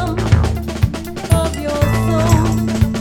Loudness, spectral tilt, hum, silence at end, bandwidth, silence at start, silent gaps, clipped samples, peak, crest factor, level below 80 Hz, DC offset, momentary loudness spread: -16 LUFS; -6.5 dB/octave; none; 0 s; 17.5 kHz; 0 s; none; under 0.1%; 0 dBFS; 14 dB; -26 dBFS; under 0.1%; 6 LU